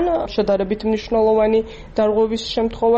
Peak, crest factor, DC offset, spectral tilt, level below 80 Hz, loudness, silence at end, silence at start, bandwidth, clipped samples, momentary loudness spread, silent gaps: -8 dBFS; 10 dB; under 0.1%; -6 dB/octave; -40 dBFS; -19 LUFS; 0 s; 0 s; 8.2 kHz; under 0.1%; 6 LU; none